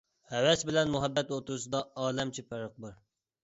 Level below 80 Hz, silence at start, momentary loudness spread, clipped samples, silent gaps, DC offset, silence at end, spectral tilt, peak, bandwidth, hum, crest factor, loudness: -62 dBFS; 0.3 s; 15 LU; under 0.1%; none; under 0.1%; 0.5 s; -4 dB/octave; -12 dBFS; 8.2 kHz; none; 20 dB; -31 LUFS